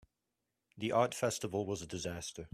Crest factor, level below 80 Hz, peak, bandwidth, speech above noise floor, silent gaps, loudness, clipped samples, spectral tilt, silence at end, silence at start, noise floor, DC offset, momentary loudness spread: 22 dB; -66 dBFS; -16 dBFS; 15.5 kHz; 51 dB; none; -36 LUFS; under 0.1%; -4.5 dB/octave; 0.05 s; 0.75 s; -87 dBFS; under 0.1%; 9 LU